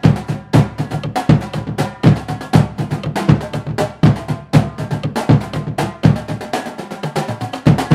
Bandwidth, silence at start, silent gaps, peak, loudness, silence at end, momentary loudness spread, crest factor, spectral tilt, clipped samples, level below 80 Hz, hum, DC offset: 13.5 kHz; 0.05 s; none; 0 dBFS; -17 LUFS; 0 s; 8 LU; 16 dB; -7.5 dB/octave; 0.2%; -36 dBFS; none; under 0.1%